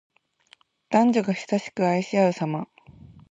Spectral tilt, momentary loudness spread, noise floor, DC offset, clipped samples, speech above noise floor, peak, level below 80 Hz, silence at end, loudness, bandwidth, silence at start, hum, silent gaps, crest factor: -6.5 dB/octave; 9 LU; -59 dBFS; under 0.1%; under 0.1%; 37 dB; -6 dBFS; -66 dBFS; 0.65 s; -24 LUFS; 8 kHz; 0.9 s; none; none; 18 dB